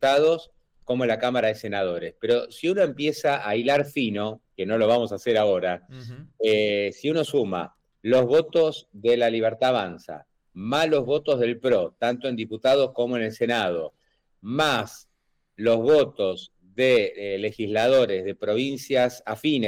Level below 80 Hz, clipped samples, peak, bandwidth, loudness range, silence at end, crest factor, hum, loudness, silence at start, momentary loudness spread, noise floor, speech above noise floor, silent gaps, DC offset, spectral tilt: -64 dBFS; under 0.1%; -12 dBFS; 16 kHz; 2 LU; 0 s; 12 dB; none; -24 LUFS; 0 s; 12 LU; -71 dBFS; 47 dB; none; under 0.1%; -5.5 dB/octave